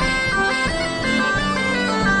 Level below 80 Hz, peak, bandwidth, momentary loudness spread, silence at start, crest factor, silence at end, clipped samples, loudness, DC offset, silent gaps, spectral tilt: -34 dBFS; -6 dBFS; 11 kHz; 2 LU; 0 s; 12 dB; 0 s; under 0.1%; -19 LUFS; under 0.1%; none; -4 dB/octave